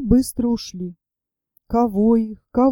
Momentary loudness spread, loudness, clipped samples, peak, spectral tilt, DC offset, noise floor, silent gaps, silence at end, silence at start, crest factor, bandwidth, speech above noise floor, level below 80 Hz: 14 LU; -20 LUFS; under 0.1%; -4 dBFS; -7 dB/octave; under 0.1%; -86 dBFS; none; 0 s; 0 s; 16 dB; 17 kHz; 68 dB; -38 dBFS